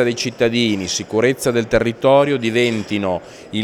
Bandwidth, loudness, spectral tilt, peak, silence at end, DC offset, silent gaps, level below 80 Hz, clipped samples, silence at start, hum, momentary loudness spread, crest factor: 15.5 kHz; -17 LUFS; -4.5 dB/octave; 0 dBFS; 0 s; under 0.1%; none; -44 dBFS; under 0.1%; 0 s; none; 7 LU; 16 dB